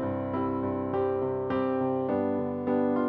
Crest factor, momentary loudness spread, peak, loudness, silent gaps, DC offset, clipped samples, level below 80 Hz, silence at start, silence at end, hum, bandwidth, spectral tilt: 12 dB; 3 LU; -16 dBFS; -29 LUFS; none; under 0.1%; under 0.1%; -60 dBFS; 0 s; 0 s; none; 4.7 kHz; -11 dB/octave